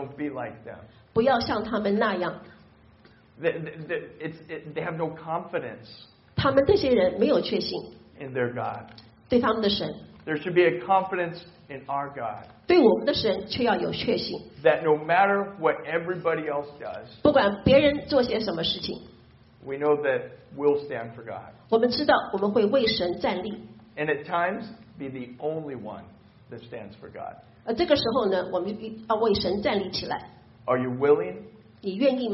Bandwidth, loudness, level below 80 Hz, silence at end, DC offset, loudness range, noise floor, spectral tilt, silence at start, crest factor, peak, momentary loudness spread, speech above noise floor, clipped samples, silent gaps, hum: 6 kHz; -25 LUFS; -54 dBFS; 0 s; under 0.1%; 8 LU; -55 dBFS; -3.5 dB/octave; 0 s; 20 dB; -6 dBFS; 19 LU; 30 dB; under 0.1%; none; none